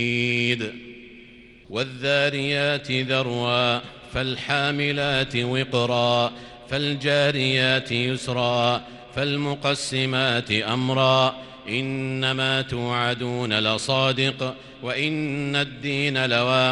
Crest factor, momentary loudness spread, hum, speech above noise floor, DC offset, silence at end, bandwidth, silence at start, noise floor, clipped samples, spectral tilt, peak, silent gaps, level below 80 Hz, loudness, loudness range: 18 dB; 9 LU; none; 24 dB; under 0.1%; 0 s; 11.5 kHz; 0 s; -47 dBFS; under 0.1%; -5 dB/octave; -4 dBFS; none; -54 dBFS; -23 LUFS; 2 LU